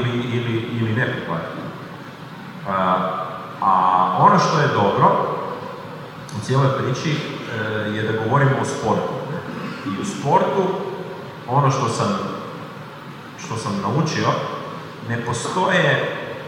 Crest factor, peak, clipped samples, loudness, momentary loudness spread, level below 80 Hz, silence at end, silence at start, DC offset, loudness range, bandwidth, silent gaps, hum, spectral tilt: 20 dB; -2 dBFS; under 0.1%; -20 LUFS; 17 LU; -60 dBFS; 0 s; 0 s; under 0.1%; 6 LU; 15.5 kHz; none; none; -6 dB/octave